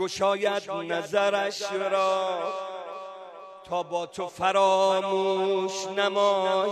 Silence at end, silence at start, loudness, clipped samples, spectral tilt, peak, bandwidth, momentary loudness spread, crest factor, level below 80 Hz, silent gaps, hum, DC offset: 0 s; 0 s; -26 LUFS; under 0.1%; -3.5 dB/octave; -10 dBFS; 12.5 kHz; 14 LU; 16 dB; -72 dBFS; none; none; under 0.1%